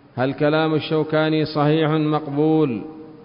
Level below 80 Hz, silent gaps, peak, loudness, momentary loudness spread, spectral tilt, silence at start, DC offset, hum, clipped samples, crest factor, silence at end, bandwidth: -58 dBFS; none; -8 dBFS; -20 LUFS; 5 LU; -12 dB/octave; 0.15 s; under 0.1%; none; under 0.1%; 12 dB; 0 s; 5.4 kHz